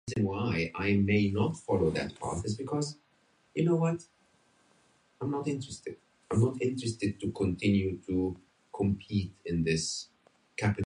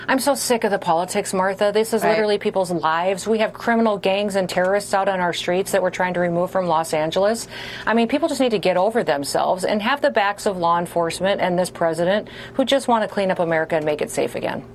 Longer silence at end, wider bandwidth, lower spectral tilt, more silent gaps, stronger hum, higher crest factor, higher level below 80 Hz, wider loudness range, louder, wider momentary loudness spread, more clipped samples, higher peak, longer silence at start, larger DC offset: about the same, 0 s vs 0 s; second, 10.5 kHz vs 14 kHz; first, -6 dB/octave vs -4 dB/octave; neither; neither; about the same, 16 dB vs 14 dB; about the same, -52 dBFS vs -54 dBFS; first, 4 LU vs 1 LU; second, -31 LUFS vs -20 LUFS; first, 12 LU vs 3 LU; neither; second, -14 dBFS vs -6 dBFS; about the same, 0.05 s vs 0 s; neither